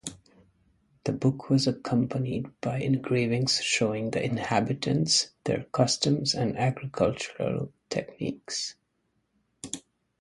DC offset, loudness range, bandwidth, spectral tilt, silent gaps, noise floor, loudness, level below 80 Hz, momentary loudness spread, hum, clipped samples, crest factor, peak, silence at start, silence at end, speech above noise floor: under 0.1%; 6 LU; 11.5 kHz; -4.5 dB/octave; none; -75 dBFS; -27 LUFS; -60 dBFS; 11 LU; none; under 0.1%; 22 dB; -8 dBFS; 0.05 s; 0.4 s; 47 dB